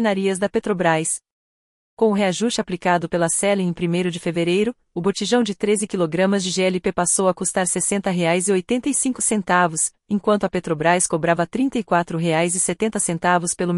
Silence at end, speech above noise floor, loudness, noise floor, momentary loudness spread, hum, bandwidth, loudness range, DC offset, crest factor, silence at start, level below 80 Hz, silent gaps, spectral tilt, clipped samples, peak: 0 s; over 70 dB; -20 LUFS; under -90 dBFS; 4 LU; none; 11.5 kHz; 2 LU; under 0.1%; 16 dB; 0 s; -54 dBFS; 1.32-1.97 s; -4 dB/octave; under 0.1%; -4 dBFS